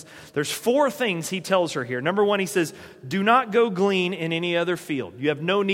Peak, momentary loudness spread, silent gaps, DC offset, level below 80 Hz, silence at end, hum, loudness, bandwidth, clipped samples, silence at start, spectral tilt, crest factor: -4 dBFS; 9 LU; none; under 0.1%; -68 dBFS; 0 s; none; -23 LUFS; 16.5 kHz; under 0.1%; 0 s; -4.5 dB/octave; 18 dB